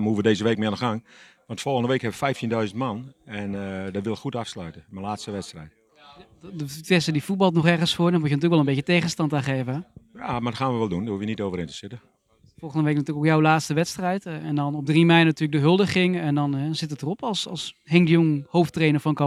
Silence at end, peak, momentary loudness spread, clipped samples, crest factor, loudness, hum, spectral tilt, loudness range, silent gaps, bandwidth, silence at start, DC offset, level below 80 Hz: 0 s; -2 dBFS; 15 LU; under 0.1%; 22 dB; -23 LUFS; none; -6 dB/octave; 9 LU; none; 13 kHz; 0 s; under 0.1%; -60 dBFS